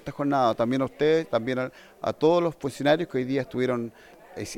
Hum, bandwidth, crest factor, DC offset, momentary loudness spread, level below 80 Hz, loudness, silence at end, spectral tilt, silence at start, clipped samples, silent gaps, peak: none; 16 kHz; 16 dB; under 0.1%; 11 LU; -60 dBFS; -25 LUFS; 0 s; -6 dB/octave; 0.05 s; under 0.1%; none; -10 dBFS